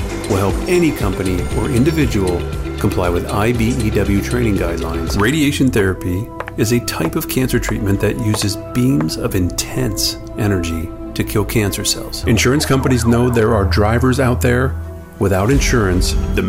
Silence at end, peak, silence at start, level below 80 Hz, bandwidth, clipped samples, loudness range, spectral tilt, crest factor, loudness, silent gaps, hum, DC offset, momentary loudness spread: 0 s; -4 dBFS; 0 s; -26 dBFS; 16.5 kHz; under 0.1%; 3 LU; -5.5 dB/octave; 12 dB; -16 LUFS; none; none; 0.2%; 6 LU